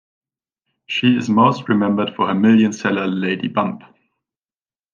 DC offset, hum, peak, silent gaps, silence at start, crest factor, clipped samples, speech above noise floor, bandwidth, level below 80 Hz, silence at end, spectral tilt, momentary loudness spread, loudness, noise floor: under 0.1%; none; -2 dBFS; none; 0.9 s; 16 dB; under 0.1%; over 73 dB; 7.4 kHz; -68 dBFS; 1.15 s; -6 dB/octave; 8 LU; -17 LUFS; under -90 dBFS